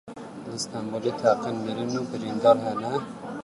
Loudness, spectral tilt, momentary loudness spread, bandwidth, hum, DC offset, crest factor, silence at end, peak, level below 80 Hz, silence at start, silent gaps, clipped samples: -26 LUFS; -5.5 dB/octave; 15 LU; 11.5 kHz; none; under 0.1%; 20 dB; 0 s; -6 dBFS; -68 dBFS; 0.05 s; none; under 0.1%